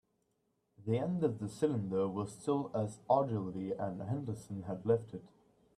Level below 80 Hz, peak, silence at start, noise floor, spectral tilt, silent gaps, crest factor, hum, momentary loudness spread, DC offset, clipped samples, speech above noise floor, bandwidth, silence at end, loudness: -72 dBFS; -16 dBFS; 0.8 s; -80 dBFS; -8 dB/octave; none; 20 dB; none; 10 LU; under 0.1%; under 0.1%; 44 dB; 12.5 kHz; 0.5 s; -36 LUFS